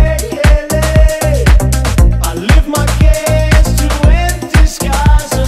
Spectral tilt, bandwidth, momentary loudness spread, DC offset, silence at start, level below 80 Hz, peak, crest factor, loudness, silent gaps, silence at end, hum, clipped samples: -5 dB/octave; 15 kHz; 3 LU; under 0.1%; 0 s; -10 dBFS; 0 dBFS; 8 dB; -11 LUFS; none; 0 s; none; 0.4%